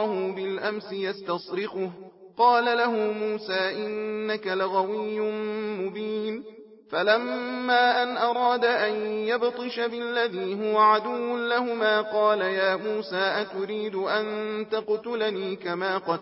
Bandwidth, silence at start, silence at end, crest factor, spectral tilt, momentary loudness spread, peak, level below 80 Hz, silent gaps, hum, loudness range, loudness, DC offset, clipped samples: 5.8 kHz; 0 s; 0 s; 18 dB; -8.5 dB/octave; 10 LU; -8 dBFS; -78 dBFS; none; none; 4 LU; -26 LUFS; under 0.1%; under 0.1%